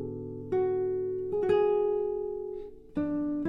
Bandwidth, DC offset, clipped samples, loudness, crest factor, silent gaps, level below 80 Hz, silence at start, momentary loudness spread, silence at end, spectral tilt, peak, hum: 4.9 kHz; under 0.1%; under 0.1%; -30 LUFS; 14 dB; none; -56 dBFS; 0 s; 12 LU; 0 s; -9 dB/octave; -16 dBFS; none